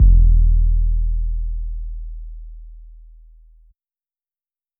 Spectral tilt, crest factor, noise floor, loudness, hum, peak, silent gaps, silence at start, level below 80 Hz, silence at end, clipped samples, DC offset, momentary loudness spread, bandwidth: -17 dB/octave; 14 dB; under -90 dBFS; -20 LUFS; none; -2 dBFS; none; 0 s; -18 dBFS; 1.95 s; under 0.1%; under 0.1%; 24 LU; 0.4 kHz